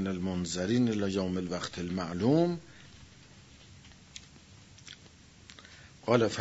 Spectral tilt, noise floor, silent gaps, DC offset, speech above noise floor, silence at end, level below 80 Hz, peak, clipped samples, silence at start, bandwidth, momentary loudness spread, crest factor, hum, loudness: -6 dB/octave; -56 dBFS; none; under 0.1%; 26 dB; 0 s; -64 dBFS; -10 dBFS; under 0.1%; 0 s; 8 kHz; 25 LU; 22 dB; none; -31 LUFS